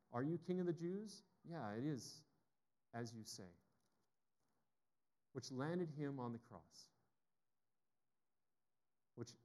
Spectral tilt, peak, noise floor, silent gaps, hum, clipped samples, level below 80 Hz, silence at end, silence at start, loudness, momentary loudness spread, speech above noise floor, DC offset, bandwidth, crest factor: -6 dB/octave; -30 dBFS; under -90 dBFS; none; none; under 0.1%; under -90 dBFS; 0.1 s; 0.1 s; -48 LUFS; 18 LU; over 42 dB; under 0.1%; 12.5 kHz; 22 dB